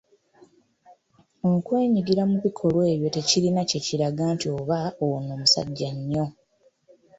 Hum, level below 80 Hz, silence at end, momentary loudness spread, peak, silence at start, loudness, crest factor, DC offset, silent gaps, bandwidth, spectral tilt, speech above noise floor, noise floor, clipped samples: none; -60 dBFS; 0.85 s; 8 LU; -6 dBFS; 0.9 s; -24 LUFS; 20 dB; under 0.1%; none; 8 kHz; -5 dB/octave; 39 dB; -62 dBFS; under 0.1%